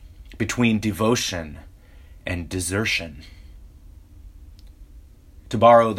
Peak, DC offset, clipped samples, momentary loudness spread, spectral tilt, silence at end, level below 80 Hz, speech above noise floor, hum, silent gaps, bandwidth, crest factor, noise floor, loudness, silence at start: -2 dBFS; under 0.1%; under 0.1%; 21 LU; -4.5 dB/octave; 0 s; -44 dBFS; 26 dB; none; none; 16 kHz; 22 dB; -46 dBFS; -22 LUFS; 0 s